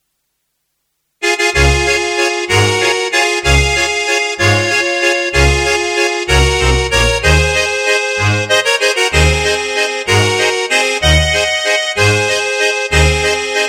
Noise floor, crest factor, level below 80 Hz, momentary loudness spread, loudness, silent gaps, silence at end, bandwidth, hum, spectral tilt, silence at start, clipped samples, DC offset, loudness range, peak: -68 dBFS; 14 dB; -22 dBFS; 3 LU; -12 LUFS; none; 0 s; 16 kHz; none; -3.5 dB/octave; 1.2 s; under 0.1%; under 0.1%; 1 LU; 0 dBFS